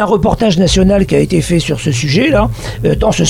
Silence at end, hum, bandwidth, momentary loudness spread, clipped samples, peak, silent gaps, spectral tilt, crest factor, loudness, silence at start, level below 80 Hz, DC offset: 0 s; none; 15.5 kHz; 5 LU; under 0.1%; 0 dBFS; none; -5.5 dB/octave; 10 dB; -12 LUFS; 0 s; -24 dBFS; under 0.1%